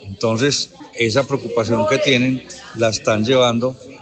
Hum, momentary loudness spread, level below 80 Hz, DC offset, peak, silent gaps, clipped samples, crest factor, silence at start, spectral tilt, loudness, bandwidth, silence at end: none; 8 LU; -54 dBFS; under 0.1%; 0 dBFS; none; under 0.1%; 18 dB; 0 s; -4.5 dB/octave; -18 LUFS; 9.2 kHz; 0.05 s